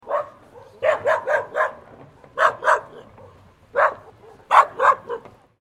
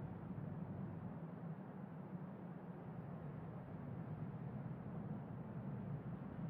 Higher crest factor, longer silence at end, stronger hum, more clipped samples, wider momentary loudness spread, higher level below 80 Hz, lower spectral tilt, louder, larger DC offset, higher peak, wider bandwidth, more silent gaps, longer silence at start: first, 22 dB vs 14 dB; first, 0.45 s vs 0 s; neither; neither; first, 17 LU vs 3 LU; first, -64 dBFS vs -70 dBFS; second, -3 dB/octave vs -10 dB/octave; first, -20 LUFS vs -50 LUFS; neither; first, 0 dBFS vs -36 dBFS; first, 13 kHz vs 4.1 kHz; neither; about the same, 0.05 s vs 0 s